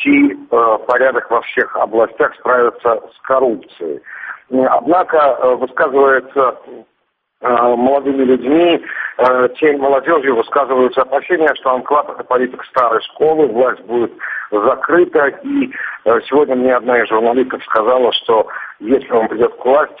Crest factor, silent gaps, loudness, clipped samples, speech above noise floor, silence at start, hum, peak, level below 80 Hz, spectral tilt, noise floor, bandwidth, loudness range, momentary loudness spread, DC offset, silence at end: 14 dB; none; -14 LUFS; under 0.1%; 47 dB; 0 s; none; 0 dBFS; -56 dBFS; -2 dB/octave; -61 dBFS; 4.9 kHz; 2 LU; 7 LU; under 0.1%; 0.05 s